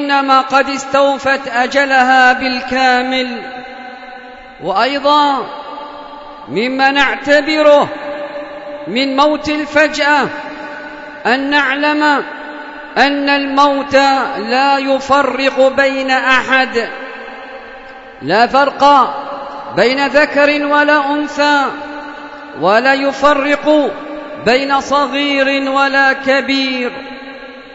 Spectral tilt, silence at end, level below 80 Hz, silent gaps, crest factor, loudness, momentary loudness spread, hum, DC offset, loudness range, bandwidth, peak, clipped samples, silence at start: -3.5 dB/octave; 0 s; -48 dBFS; none; 14 dB; -12 LUFS; 18 LU; none; under 0.1%; 3 LU; 8 kHz; 0 dBFS; under 0.1%; 0 s